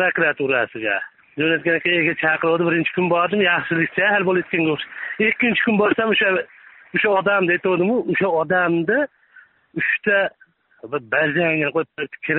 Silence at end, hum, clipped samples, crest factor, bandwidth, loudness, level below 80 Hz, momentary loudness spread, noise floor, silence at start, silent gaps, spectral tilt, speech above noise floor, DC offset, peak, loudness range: 0 s; none; under 0.1%; 14 dB; 4.1 kHz; -19 LUFS; -62 dBFS; 8 LU; -51 dBFS; 0 s; none; -3 dB/octave; 32 dB; under 0.1%; -6 dBFS; 3 LU